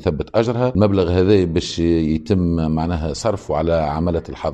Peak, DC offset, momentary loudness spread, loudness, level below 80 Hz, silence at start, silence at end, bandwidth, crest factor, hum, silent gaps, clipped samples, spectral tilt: -2 dBFS; under 0.1%; 6 LU; -18 LUFS; -36 dBFS; 0 s; 0 s; 9.2 kHz; 14 dB; none; none; under 0.1%; -7 dB/octave